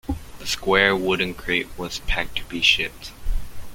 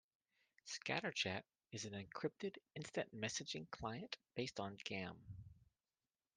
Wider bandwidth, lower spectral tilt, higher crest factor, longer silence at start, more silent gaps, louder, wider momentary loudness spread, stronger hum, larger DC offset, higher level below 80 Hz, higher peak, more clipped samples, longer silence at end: first, 17 kHz vs 10.5 kHz; about the same, -3 dB/octave vs -3.5 dB/octave; about the same, 22 dB vs 24 dB; second, 0.05 s vs 0.65 s; neither; first, -21 LUFS vs -47 LUFS; first, 16 LU vs 12 LU; neither; neither; first, -32 dBFS vs -76 dBFS; first, -2 dBFS vs -24 dBFS; neither; second, 0 s vs 0.85 s